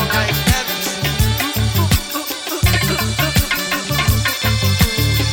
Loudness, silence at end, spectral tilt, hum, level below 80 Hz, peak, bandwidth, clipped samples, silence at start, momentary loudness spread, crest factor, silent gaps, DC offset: -16 LUFS; 0 s; -4 dB/octave; none; -26 dBFS; 0 dBFS; 17.5 kHz; under 0.1%; 0 s; 4 LU; 16 dB; none; under 0.1%